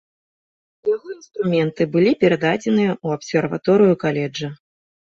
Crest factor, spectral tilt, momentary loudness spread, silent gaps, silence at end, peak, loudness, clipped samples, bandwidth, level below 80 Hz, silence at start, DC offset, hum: 16 dB; -7 dB/octave; 11 LU; none; 0.5 s; -4 dBFS; -19 LUFS; under 0.1%; 7.8 kHz; -60 dBFS; 0.85 s; under 0.1%; none